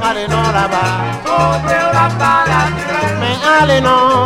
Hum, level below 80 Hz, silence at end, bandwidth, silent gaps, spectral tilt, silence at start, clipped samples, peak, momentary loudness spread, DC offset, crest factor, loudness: none; -34 dBFS; 0 s; 15.5 kHz; none; -5 dB/octave; 0 s; under 0.1%; 0 dBFS; 6 LU; under 0.1%; 12 dB; -12 LUFS